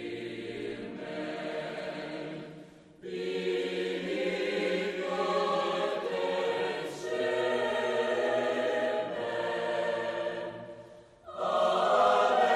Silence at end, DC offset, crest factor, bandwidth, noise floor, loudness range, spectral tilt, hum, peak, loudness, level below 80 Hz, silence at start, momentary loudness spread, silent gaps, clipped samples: 0 s; under 0.1%; 18 dB; 13 kHz; -51 dBFS; 6 LU; -4.5 dB/octave; none; -14 dBFS; -31 LUFS; -70 dBFS; 0 s; 13 LU; none; under 0.1%